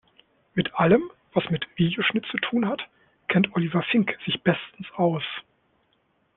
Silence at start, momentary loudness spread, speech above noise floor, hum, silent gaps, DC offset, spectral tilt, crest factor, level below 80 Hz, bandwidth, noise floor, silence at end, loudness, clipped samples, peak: 0.55 s; 11 LU; 44 dB; none; none; under 0.1%; -4.5 dB/octave; 20 dB; -60 dBFS; 4.1 kHz; -68 dBFS; 0.95 s; -25 LUFS; under 0.1%; -6 dBFS